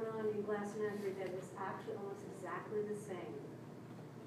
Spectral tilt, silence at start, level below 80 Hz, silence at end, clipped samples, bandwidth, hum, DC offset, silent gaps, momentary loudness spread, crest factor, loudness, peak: -6.5 dB/octave; 0 s; -84 dBFS; 0 s; under 0.1%; 15 kHz; none; under 0.1%; none; 12 LU; 14 dB; -44 LUFS; -28 dBFS